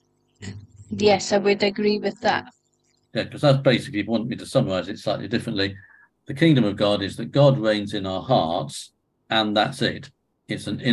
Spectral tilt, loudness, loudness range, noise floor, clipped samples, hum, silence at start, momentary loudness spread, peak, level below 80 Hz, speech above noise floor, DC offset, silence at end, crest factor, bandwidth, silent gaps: -6 dB/octave; -22 LUFS; 2 LU; -67 dBFS; under 0.1%; none; 0.4 s; 15 LU; -4 dBFS; -54 dBFS; 45 dB; under 0.1%; 0 s; 20 dB; 12 kHz; none